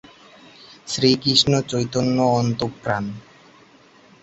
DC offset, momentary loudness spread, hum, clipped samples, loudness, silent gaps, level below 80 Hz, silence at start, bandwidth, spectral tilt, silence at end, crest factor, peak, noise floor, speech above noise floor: under 0.1%; 14 LU; none; under 0.1%; -20 LUFS; none; -52 dBFS; 0.7 s; 8.2 kHz; -5 dB/octave; 1.05 s; 20 dB; -2 dBFS; -51 dBFS; 31 dB